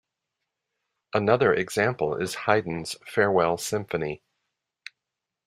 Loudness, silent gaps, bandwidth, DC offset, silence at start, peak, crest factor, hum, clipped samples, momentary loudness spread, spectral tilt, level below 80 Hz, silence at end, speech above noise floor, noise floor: -25 LUFS; none; 15.5 kHz; under 0.1%; 1.15 s; -4 dBFS; 24 dB; none; under 0.1%; 20 LU; -5 dB/octave; -62 dBFS; 1.3 s; 61 dB; -86 dBFS